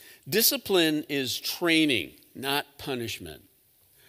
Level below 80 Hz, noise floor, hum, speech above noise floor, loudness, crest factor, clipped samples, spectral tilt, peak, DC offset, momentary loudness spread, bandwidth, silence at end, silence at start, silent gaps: -66 dBFS; -62 dBFS; none; 35 dB; -26 LUFS; 20 dB; under 0.1%; -2.5 dB/octave; -8 dBFS; under 0.1%; 13 LU; 16.5 kHz; 0.7 s; 0.05 s; none